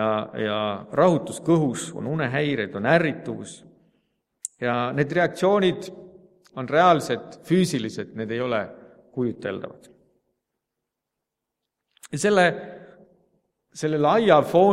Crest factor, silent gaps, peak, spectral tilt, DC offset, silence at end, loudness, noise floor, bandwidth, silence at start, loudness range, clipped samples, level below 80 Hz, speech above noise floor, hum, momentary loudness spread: 22 dB; none; -2 dBFS; -5.5 dB/octave; under 0.1%; 0 s; -23 LUFS; -84 dBFS; 15 kHz; 0 s; 9 LU; under 0.1%; -64 dBFS; 62 dB; none; 18 LU